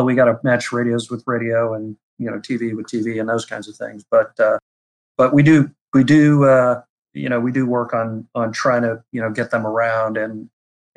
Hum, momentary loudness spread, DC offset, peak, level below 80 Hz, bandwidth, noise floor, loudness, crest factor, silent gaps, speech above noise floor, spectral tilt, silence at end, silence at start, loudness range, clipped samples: none; 16 LU; under 0.1%; -4 dBFS; -60 dBFS; 11 kHz; under -90 dBFS; -18 LUFS; 14 dB; 2.03-2.17 s, 4.62-5.15 s, 5.81-5.92 s, 6.89-7.03 s; over 73 dB; -7 dB/octave; 0.55 s; 0 s; 7 LU; under 0.1%